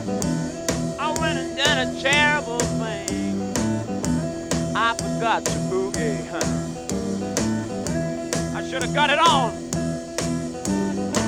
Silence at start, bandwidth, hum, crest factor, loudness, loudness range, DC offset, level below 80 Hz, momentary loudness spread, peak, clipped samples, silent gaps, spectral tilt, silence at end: 0 s; 17 kHz; none; 20 dB; -23 LUFS; 3 LU; under 0.1%; -44 dBFS; 9 LU; -4 dBFS; under 0.1%; none; -4 dB/octave; 0 s